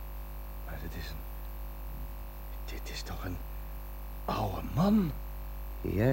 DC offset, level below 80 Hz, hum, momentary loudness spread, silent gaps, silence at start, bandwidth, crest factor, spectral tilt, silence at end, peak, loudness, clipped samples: under 0.1%; -40 dBFS; 50 Hz at -40 dBFS; 15 LU; none; 0 s; 17 kHz; 20 dB; -7 dB/octave; 0 s; -14 dBFS; -36 LUFS; under 0.1%